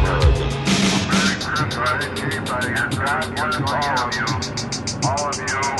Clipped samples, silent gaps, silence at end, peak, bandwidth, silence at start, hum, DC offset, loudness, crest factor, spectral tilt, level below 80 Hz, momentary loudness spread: under 0.1%; none; 0 s; -4 dBFS; 12 kHz; 0 s; none; under 0.1%; -20 LUFS; 16 dB; -4 dB/octave; -30 dBFS; 6 LU